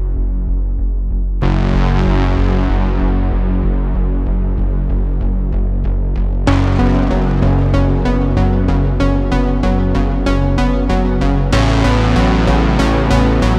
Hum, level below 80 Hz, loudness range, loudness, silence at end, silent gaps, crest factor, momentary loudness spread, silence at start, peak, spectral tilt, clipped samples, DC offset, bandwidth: none; -16 dBFS; 3 LU; -15 LUFS; 0 s; none; 12 dB; 6 LU; 0 s; 0 dBFS; -7.5 dB/octave; under 0.1%; under 0.1%; 8.4 kHz